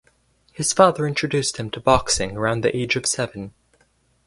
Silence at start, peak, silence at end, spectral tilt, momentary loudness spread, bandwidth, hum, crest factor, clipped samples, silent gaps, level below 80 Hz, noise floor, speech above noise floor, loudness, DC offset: 0.6 s; 0 dBFS; 0.75 s; -3.5 dB/octave; 9 LU; 11.5 kHz; none; 22 dB; under 0.1%; none; -44 dBFS; -62 dBFS; 42 dB; -20 LUFS; under 0.1%